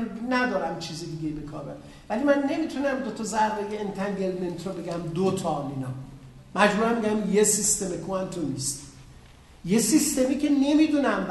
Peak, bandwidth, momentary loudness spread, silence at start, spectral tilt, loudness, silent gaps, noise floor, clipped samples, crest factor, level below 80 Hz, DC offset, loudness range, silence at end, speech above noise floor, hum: -4 dBFS; 12.5 kHz; 14 LU; 0 s; -4 dB/octave; -25 LUFS; none; -50 dBFS; under 0.1%; 22 dB; -54 dBFS; under 0.1%; 4 LU; 0 s; 24 dB; none